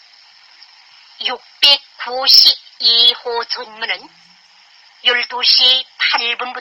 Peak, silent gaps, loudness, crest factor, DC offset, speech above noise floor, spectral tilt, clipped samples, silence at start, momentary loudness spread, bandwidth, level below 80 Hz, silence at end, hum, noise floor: 0 dBFS; none; -12 LUFS; 16 dB; under 0.1%; 33 dB; 1.5 dB/octave; under 0.1%; 1.2 s; 15 LU; over 20 kHz; -68 dBFS; 0 s; none; -48 dBFS